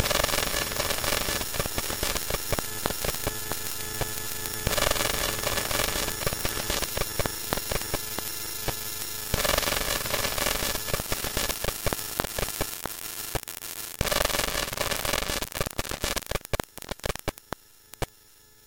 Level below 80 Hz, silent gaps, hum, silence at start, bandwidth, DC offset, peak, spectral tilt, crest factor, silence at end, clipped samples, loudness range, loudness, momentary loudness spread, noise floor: -40 dBFS; none; none; 0 s; 17.5 kHz; under 0.1%; -2 dBFS; -2 dB/octave; 28 dB; 0.6 s; under 0.1%; 3 LU; -28 LUFS; 9 LU; -55 dBFS